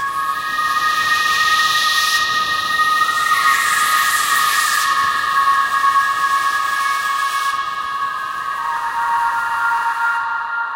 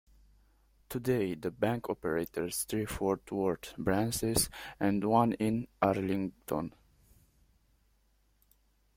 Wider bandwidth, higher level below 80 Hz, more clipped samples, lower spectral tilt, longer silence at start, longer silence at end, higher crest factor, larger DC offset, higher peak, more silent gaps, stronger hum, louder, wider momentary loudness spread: about the same, 16 kHz vs 16.5 kHz; about the same, -56 dBFS vs -56 dBFS; neither; second, 1 dB/octave vs -5 dB/octave; second, 0 s vs 0.9 s; second, 0 s vs 2.3 s; second, 14 dB vs 20 dB; neither; first, -2 dBFS vs -14 dBFS; neither; neither; first, -16 LUFS vs -32 LUFS; about the same, 7 LU vs 8 LU